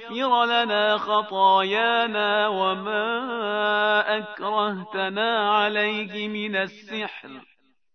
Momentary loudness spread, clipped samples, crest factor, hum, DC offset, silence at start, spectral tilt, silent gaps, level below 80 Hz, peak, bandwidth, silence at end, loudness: 9 LU; under 0.1%; 16 dB; none; under 0.1%; 0 s; -5 dB/octave; none; -82 dBFS; -8 dBFS; 6.4 kHz; 0.55 s; -23 LUFS